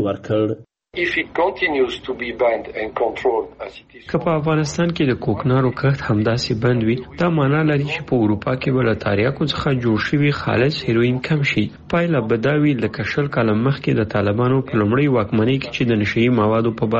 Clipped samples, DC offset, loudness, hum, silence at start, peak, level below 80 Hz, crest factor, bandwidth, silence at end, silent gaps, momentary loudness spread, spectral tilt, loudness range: under 0.1%; under 0.1%; -19 LUFS; none; 0 s; -6 dBFS; -46 dBFS; 12 dB; 8 kHz; 0 s; none; 5 LU; -7 dB/octave; 3 LU